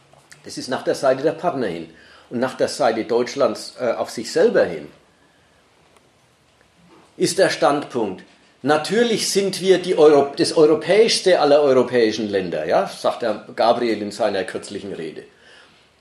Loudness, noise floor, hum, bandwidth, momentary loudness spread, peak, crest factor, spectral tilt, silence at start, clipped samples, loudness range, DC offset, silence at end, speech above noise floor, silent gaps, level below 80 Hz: -19 LUFS; -57 dBFS; none; 13 kHz; 15 LU; -2 dBFS; 18 dB; -4 dB/octave; 0.45 s; under 0.1%; 8 LU; under 0.1%; 0.75 s; 38 dB; none; -68 dBFS